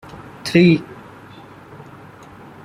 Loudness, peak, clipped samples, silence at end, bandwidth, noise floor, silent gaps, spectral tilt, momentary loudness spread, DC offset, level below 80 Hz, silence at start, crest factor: -16 LUFS; -2 dBFS; under 0.1%; 1.8 s; 13 kHz; -41 dBFS; none; -7 dB/octave; 27 LU; under 0.1%; -54 dBFS; 0.45 s; 18 dB